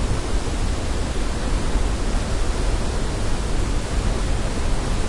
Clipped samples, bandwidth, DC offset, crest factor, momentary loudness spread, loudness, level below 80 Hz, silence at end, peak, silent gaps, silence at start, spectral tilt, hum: under 0.1%; 11.5 kHz; under 0.1%; 12 dB; 1 LU; -25 LUFS; -22 dBFS; 0 s; -8 dBFS; none; 0 s; -5 dB/octave; none